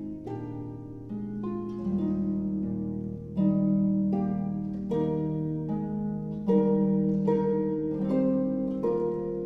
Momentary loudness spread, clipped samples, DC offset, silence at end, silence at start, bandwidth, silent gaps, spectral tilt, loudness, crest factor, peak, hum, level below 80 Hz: 12 LU; under 0.1%; under 0.1%; 0 s; 0 s; 3.7 kHz; none; -11.5 dB/octave; -29 LUFS; 16 dB; -12 dBFS; none; -52 dBFS